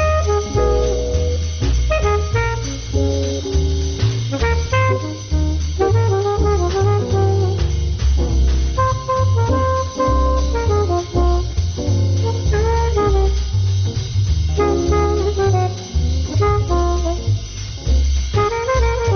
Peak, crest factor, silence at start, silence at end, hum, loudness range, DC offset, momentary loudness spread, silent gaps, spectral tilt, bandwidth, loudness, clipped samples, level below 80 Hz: -6 dBFS; 10 dB; 0 s; 0 s; none; 2 LU; under 0.1%; 4 LU; none; -6 dB/octave; 6.6 kHz; -18 LUFS; under 0.1%; -20 dBFS